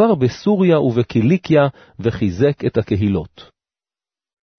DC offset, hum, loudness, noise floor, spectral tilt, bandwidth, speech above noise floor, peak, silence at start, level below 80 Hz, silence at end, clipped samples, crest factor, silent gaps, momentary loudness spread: under 0.1%; none; -17 LUFS; under -90 dBFS; -8.5 dB/octave; 6.6 kHz; over 74 dB; -2 dBFS; 0 s; -46 dBFS; 1.15 s; under 0.1%; 14 dB; none; 8 LU